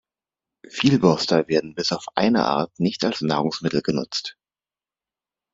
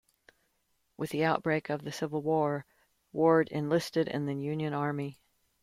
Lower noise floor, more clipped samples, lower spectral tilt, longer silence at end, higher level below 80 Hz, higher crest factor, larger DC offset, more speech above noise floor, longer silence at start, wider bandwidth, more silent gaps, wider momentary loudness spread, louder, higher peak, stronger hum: first, under -90 dBFS vs -76 dBFS; neither; about the same, -5.5 dB/octave vs -6.5 dB/octave; first, 1.25 s vs 0.5 s; first, -60 dBFS vs -70 dBFS; about the same, 22 dB vs 20 dB; neither; first, over 69 dB vs 46 dB; second, 0.75 s vs 1 s; second, 7.8 kHz vs 15.5 kHz; neither; second, 8 LU vs 12 LU; first, -22 LUFS vs -31 LUFS; first, -2 dBFS vs -12 dBFS; neither